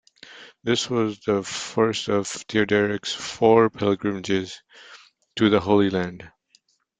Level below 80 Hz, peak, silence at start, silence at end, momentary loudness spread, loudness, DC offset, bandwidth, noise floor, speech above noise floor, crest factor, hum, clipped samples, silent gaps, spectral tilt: -60 dBFS; -4 dBFS; 0.3 s; 0.7 s; 16 LU; -22 LUFS; under 0.1%; 9.4 kHz; -63 dBFS; 41 dB; 20 dB; none; under 0.1%; none; -5 dB/octave